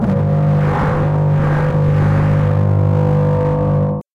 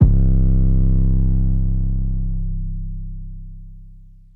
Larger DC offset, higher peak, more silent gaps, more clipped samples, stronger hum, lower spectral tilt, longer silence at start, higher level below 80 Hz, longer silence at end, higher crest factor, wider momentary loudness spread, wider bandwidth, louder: neither; second, -6 dBFS vs -2 dBFS; neither; neither; neither; second, -10 dB/octave vs -13.5 dB/octave; about the same, 0 s vs 0 s; second, -32 dBFS vs -18 dBFS; second, 0.15 s vs 0.4 s; second, 8 dB vs 16 dB; second, 2 LU vs 19 LU; first, 4.6 kHz vs 1.2 kHz; first, -15 LUFS vs -20 LUFS